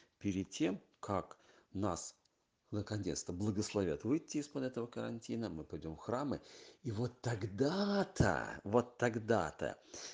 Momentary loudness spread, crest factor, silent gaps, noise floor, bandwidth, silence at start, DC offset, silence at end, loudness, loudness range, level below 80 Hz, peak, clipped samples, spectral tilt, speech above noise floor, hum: 11 LU; 22 dB; none; -78 dBFS; 10 kHz; 0.2 s; under 0.1%; 0 s; -39 LUFS; 5 LU; -64 dBFS; -16 dBFS; under 0.1%; -5.5 dB/octave; 40 dB; none